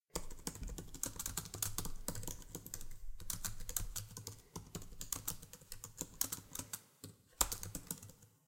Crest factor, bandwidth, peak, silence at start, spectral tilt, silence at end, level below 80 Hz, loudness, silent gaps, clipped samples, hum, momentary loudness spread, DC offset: 34 dB; 17 kHz; -10 dBFS; 0.15 s; -2 dB/octave; 0.2 s; -52 dBFS; -44 LUFS; none; under 0.1%; none; 12 LU; under 0.1%